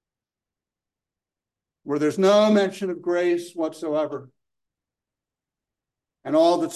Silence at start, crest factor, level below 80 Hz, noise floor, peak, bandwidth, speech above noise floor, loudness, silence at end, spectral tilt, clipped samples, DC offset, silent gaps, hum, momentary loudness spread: 1.85 s; 18 dB; -78 dBFS; -90 dBFS; -6 dBFS; 12.5 kHz; 68 dB; -22 LUFS; 0 s; -5.5 dB/octave; under 0.1%; under 0.1%; none; none; 13 LU